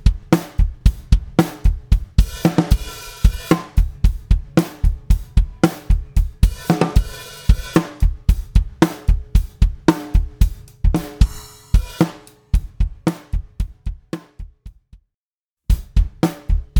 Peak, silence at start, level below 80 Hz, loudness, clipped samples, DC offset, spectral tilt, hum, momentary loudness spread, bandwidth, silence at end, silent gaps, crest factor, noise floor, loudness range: 0 dBFS; 0.05 s; -20 dBFS; -20 LUFS; under 0.1%; under 0.1%; -6.5 dB/octave; none; 11 LU; 19 kHz; 0 s; 15.14-15.57 s; 18 dB; under -90 dBFS; 7 LU